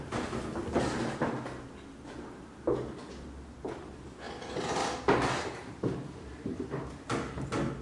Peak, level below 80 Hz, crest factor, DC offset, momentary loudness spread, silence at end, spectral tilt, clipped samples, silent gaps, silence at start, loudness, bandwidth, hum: -12 dBFS; -52 dBFS; 24 dB; under 0.1%; 15 LU; 0 s; -5.5 dB/octave; under 0.1%; none; 0 s; -35 LUFS; 11.5 kHz; none